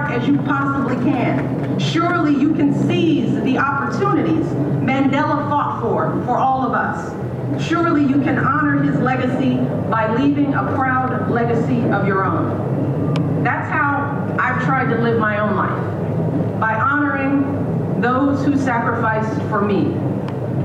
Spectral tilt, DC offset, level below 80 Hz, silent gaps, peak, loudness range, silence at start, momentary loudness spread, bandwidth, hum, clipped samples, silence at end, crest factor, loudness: -8 dB/octave; under 0.1%; -48 dBFS; none; -6 dBFS; 1 LU; 0 s; 4 LU; 8.4 kHz; none; under 0.1%; 0 s; 12 dB; -18 LUFS